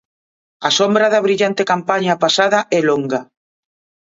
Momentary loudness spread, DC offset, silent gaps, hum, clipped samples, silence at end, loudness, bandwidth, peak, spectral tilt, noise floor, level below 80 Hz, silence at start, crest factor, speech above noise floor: 7 LU; under 0.1%; none; none; under 0.1%; 0.8 s; -15 LUFS; 7.8 kHz; 0 dBFS; -3.5 dB/octave; under -90 dBFS; -66 dBFS; 0.6 s; 16 dB; over 75 dB